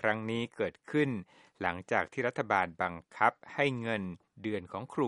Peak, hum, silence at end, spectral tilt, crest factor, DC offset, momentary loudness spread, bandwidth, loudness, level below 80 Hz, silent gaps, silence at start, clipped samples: -10 dBFS; none; 0 s; -6.5 dB/octave; 22 dB; under 0.1%; 8 LU; 11 kHz; -33 LUFS; -70 dBFS; none; 0 s; under 0.1%